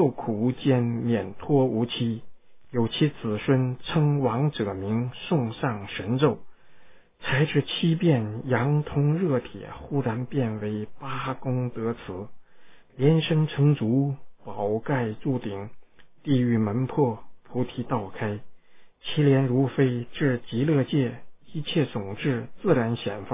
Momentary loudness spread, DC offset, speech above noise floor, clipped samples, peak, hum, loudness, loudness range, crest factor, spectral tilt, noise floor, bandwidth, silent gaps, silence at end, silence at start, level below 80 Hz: 12 LU; under 0.1%; 27 dB; under 0.1%; -8 dBFS; none; -26 LUFS; 3 LU; 18 dB; -11.5 dB/octave; -51 dBFS; 3.8 kHz; none; 0 s; 0 s; -56 dBFS